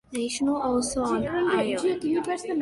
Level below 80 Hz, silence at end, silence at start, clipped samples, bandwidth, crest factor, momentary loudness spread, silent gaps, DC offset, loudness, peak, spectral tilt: -52 dBFS; 0 s; 0.1 s; under 0.1%; 11.5 kHz; 14 dB; 3 LU; none; under 0.1%; -26 LUFS; -12 dBFS; -4 dB/octave